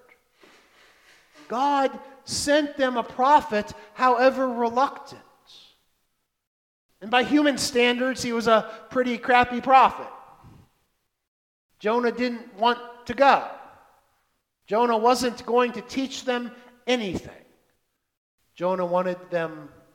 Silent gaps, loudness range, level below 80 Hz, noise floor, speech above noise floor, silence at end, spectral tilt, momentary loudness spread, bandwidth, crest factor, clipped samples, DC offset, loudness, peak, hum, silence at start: 6.47-6.89 s, 11.27-11.69 s, 18.17-18.38 s; 7 LU; -60 dBFS; -75 dBFS; 52 dB; 0.3 s; -3.5 dB/octave; 14 LU; 16.5 kHz; 22 dB; under 0.1%; under 0.1%; -23 LUFS; -4 dBFS; none; 1.5 s